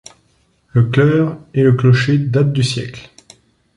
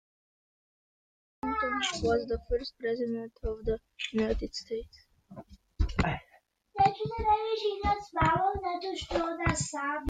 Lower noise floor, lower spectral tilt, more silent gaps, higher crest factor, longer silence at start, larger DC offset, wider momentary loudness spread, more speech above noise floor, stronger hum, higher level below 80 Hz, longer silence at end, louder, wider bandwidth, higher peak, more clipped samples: second, -58 dBFS vs -65 dBFS; first, -7 dB/octave vs -4.5 dB/octave; neither; second, 14 dB vs 20 dB; second, 0.75 s vs 1.45 s; neither; about the same, 10 LU vs 11 LU; first, 45 dB vs 34 dB; neither; second, -48 dBFS vs -42 dBFS; first, 0.75 s vs 0 s; first, -15 LUFS vs -31 LUFS; first, 11 kHz vs 9.6 kHz; first, -2 dBFS vs -12 dBFS; neither